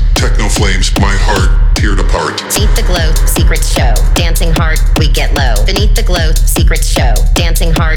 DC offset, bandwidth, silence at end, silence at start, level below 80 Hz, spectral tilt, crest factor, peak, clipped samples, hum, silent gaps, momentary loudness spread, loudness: under 0.1%; 18 kHz; 0 s; 0 s; -10 dBFS; -4 dB/octave; 8 dB; 0 dBFS; under 0.1%; none; none; 1 LU; -11 LUFS